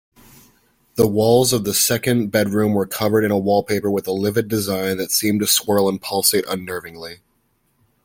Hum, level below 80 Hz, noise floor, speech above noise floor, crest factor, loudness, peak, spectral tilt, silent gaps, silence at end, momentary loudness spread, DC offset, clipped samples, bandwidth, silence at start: none; -54 dBFS; -65 dBFS; 46 dB; 18 dB; -18 LUFS; -2 dBFS; -4 dB/octave; none; 0.9 s; 10 LU; under 0.1%; under 0.1%; 17 kHz; 0.95 s